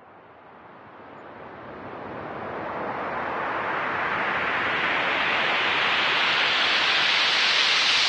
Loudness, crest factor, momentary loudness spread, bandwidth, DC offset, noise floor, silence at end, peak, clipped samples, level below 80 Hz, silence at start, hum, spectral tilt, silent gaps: -22 LUFS; 16 dB; 19 LU; 11 kHz; under 0.1%; -48 dBFS; 0 s; -8 dBFS; under 0.1%; -64 dBFS; 0.05 s; none; -1.5 dB/octave; none